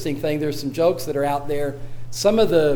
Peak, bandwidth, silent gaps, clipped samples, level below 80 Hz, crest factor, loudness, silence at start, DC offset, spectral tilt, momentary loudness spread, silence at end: -6 dBFS; over 20 kHz; none; under 0.1%; -42 dBFS; 16 dB; -21 LUFS; 0 s; under 0.1%; -5.5 dB/octave; 11 LU; 0 s